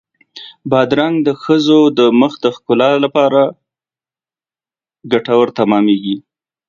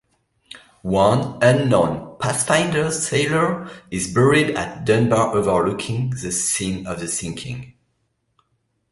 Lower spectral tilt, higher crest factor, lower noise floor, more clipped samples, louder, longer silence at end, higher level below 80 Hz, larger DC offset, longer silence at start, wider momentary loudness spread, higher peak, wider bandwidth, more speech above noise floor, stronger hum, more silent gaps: first, -6.5 dB/octave vs -4.5 dB/octave; about the same, 14 dB vs 18 dB; first, under -90 dBFS vs -70 dBFS; neither; first, -13 LUFS vs -19 LUFS; second, 0.5 s vs 1.2 s; second, -60 dBFS vs -48 dBFS; neither; second, 0.35 s vs 0.55 s; about the same, 10 LU vs 11 LU; about the same, 0 dBFS vs -2 dBFS; second, 7.4 kHz vs 12 kHz; first, over 78 dB vs 50 dB; neither; neither